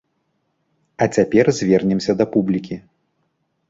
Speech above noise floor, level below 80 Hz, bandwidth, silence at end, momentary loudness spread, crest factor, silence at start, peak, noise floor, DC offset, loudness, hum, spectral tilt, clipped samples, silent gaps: 52 dB; -54 dBFS; 7.8 kHz; 0.9 s; 9 LU; 18 dB; 1 s; -2 dBFS; -69 dBFS; under 0.1%; -18 LUFS; none; -6.5 dB/octave; under 0.1%; none